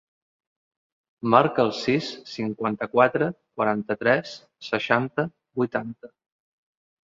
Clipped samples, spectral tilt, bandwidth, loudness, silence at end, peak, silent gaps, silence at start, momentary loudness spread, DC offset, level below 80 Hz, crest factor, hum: under 0.1%; -6 dB/octave; 7.6 kHz; -24 LUFS; 0.95 s; -2 dBFS; none; 1.25 s; 12 LU; under 0.1%; -66 dBFS; 24 dB; none